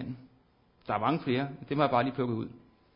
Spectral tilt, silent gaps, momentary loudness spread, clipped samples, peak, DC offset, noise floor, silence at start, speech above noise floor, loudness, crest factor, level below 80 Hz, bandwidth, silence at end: -5.5 dB/octave; none; 16 LU; under 0.1%; -12 dBFS; under 0.1%; -65 dBFS; 0 s; 35 dB; -30 LUFS; 20 dB; -64 dBFS; 5.4 kHz; 0.4 s